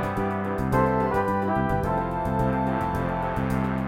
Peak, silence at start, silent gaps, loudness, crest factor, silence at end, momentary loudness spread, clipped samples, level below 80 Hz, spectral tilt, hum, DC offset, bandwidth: -10 dBFS; 0 s; none; -25 LUFS; 14 dB; 0 s; 4 LU; under 0.1%; -38 dBFS; -8.5 dB/octave; none; under 0.1%; 16.5 kHz